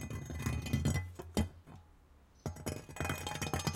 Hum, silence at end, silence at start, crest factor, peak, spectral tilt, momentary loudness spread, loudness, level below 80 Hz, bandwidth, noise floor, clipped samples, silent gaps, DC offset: none; 0 s; 0 s; 20 dB; -18 dBFS; -5 dB/octave; 12 LU; -39 LUFS; -50 dBFS; 17 kHz; -63 dBFS; under 0.1%; none; under 0.1%